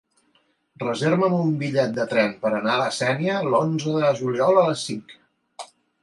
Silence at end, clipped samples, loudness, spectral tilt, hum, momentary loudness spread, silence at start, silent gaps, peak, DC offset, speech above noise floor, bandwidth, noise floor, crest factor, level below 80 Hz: 0.4 s; under 0.1%; -22 LUFS; -5.5 dB/octave; none; 13 LU; 0.8 s; none; -6 dBFS; under 0.1%; 44 dB; 11.5 kHz; -65 dBFS; 18 dB; -70 dBFS